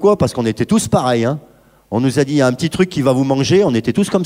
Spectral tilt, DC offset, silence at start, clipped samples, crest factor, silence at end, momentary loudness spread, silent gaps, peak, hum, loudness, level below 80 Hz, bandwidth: -6 dB/octave; under 0.1%; 0 s; under 0.1%; 14 dB; 0 s; 5 LU; none; -2 dBFS; none; -15 LUFS; -46 dBFS; 16 kHz